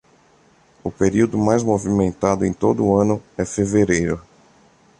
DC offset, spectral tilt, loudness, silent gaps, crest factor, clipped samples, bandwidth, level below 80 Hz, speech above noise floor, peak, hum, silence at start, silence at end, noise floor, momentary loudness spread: under 0.1%; -6.5 dB/octave; -19 LUFS; none; 18 dB; under 0.1%; 11 kHz; -44 dBFS; 36 dB; -2 dBFS; none; 0.85 s; 0.8 s; -55 dBFS; 8 LU